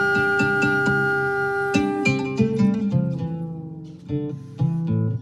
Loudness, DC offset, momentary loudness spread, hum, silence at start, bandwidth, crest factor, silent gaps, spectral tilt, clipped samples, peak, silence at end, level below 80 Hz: -22 LUFS; under 0.1%; 12 LU; none; 0 s; 12 kHz; 16 dB; none; -7 dB/octave; under 0.1%; -6 dBFS; 0 s; -52 dBFS